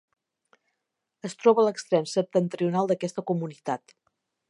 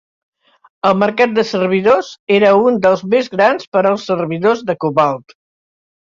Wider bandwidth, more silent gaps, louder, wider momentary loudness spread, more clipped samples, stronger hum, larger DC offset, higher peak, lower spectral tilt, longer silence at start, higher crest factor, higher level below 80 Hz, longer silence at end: first, 11 kHz vs 7.6 kHz; second, none vs 2.19-2.27 s, 3.67-3.72 s; second, -26 LUFS vs -14 LUFS; first, 12 LU vs 6 LU; neither; neither; neither; second, -6 dBFS vs -2 dBFS; about the same, -6 dB/octave vs -6 dB/octave; first, 1.25 s vs 0.85 s; first, 22 dB vs 14 dB; second, -82 dBFS vs -58 dBFS; second, 0.7 s vs 0.9 s